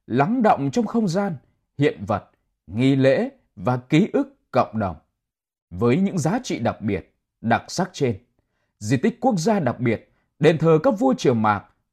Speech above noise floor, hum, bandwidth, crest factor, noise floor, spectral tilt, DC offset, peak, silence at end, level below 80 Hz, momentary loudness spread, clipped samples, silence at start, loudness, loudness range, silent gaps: 61 dB; none; 13.5 kHz; 18 dB; -81 dBFS; -6.5 dB/octave; under 0.1%; -4 dBFS; 0.3 s; -56 dBFS; 11 LU; under 0.1%; 0.1 s; -22 LUFS; 4 LU; 5.62-5.68 s